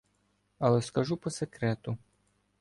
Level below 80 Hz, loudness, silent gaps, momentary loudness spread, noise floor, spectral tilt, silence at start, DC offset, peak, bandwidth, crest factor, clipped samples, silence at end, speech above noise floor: -64 dBFS; -31 LUFS; none; 10 LU; -73 dBFS; -6.5 dB/octave; 0.6 s; under 0.1%; -12 dBFS; 11.5 kHz; 20 dB; under 0.1%; 0.65 s; 43 dB